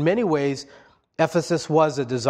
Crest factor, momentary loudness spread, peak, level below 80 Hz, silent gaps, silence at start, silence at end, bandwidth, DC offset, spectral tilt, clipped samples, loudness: 18 dB; 9 LU; -6 dBFS; -62 dBFS; none; 0 s; 0 s; 13 kHz; under 0.1%; -6 dB/octave; under 0.1%; -22 LUFS